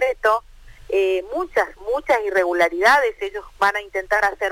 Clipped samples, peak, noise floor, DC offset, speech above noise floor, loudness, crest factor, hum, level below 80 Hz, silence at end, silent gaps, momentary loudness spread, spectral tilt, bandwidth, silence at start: under 0.1%; -6 dBFS; -43 dBFS; under 0.1%; 23 dB; -20 LUFS; 14 dB; none; -48 dBFS; 0 s; none; 9 LU; -3 dB/octave; 17 kHz; 0 s